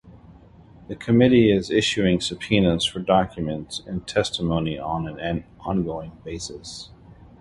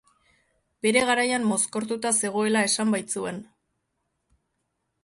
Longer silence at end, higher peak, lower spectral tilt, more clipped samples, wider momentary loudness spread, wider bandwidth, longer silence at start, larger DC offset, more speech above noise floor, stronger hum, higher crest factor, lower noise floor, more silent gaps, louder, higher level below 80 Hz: second, 0.3 s vs 1.6 s; about the same, -4 dBFS vs -6 dBFS; first, -5.5 dB/octave vs -2.5 dB/octave; neither; first, 17 LU vs 9 LU; about the same, 11.5 kHz vs 11.5 kHz; second, 0.05 s vs 0.85 s; neither; second, 26 dB vs 53 dB; neither; about the same, 20 dB vs 20 dB; second, -48 dBFS vs -77 dBFS; neither; about the same, -22 LUFS vs -24 LUFS; first, -44 dBFS vs -68 dBFS